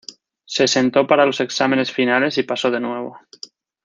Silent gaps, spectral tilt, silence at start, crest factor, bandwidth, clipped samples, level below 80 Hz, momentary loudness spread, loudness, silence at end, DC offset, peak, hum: none; -3.5 dB/octave; 0.1 s; 18 dB; 9.4 kHz; under 0.1%; -66 dBFS; 22 LU; -18 LUFS; 0.65 s; under 0.1%; -2 dBFS; none